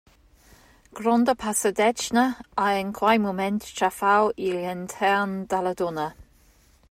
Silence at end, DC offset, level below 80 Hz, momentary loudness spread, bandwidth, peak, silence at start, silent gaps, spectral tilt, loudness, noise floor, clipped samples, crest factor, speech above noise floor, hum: 0.7 s; under 0.1%; -58 dBFS; 7 LU; 16 kHz; -8 dBFS; 0.95 s; none; -4 dB/octave; -24 LUFS; -58 dBFS; under 0.1%; 18 dB; 34 dB; none